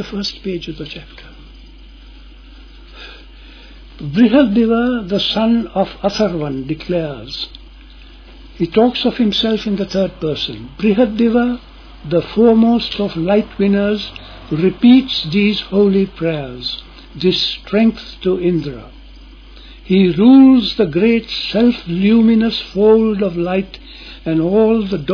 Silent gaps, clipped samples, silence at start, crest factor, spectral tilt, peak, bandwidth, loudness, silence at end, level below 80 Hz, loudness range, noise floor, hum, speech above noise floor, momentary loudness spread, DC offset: none; under 0.1%; 0 s; 14 dB; -7 dB/octave; 0 dBFS; 5.4 kHz; -15 LUFS; 0 s; -38 dBFS; 7 LU; -38 dBFS; none; 24 dB; 16 LU; under 0.1%